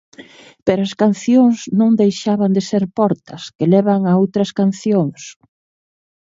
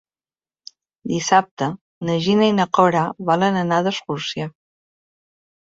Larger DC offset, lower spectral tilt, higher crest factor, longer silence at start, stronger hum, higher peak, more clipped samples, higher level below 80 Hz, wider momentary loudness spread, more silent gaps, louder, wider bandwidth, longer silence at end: neither; first, -7 dB/octave vs -5 dB/octave; about the same, 16 dB vs 20 dB; second, 0.2 s vs 1.05 s; neither; about the same, 0 dBFS vs -2 dBFS; neither; about the same, -60 dBFS vs -62 dBFS; about the same, 9 LU vs 11 LU; second, 3.55-3.59 s vs 1.51-1.57 s, 1.81-2.01 s; first, -16 LUFS vs -19 LUFS; about the same, 7.8 kHz vs 7.8 kHz; second, 1 s vs 1.3 s